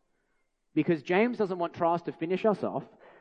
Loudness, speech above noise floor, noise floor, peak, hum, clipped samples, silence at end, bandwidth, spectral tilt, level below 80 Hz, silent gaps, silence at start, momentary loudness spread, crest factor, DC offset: -29 LUFS; 46 dB; -74 dBFS; -12 dBFS; none; under 0.1%; 0.35 s; 8.2 kHz; -8 dB/octave; -74 dBFS; none; 0.75 s; 7 LU; 18 dB; under 0.1%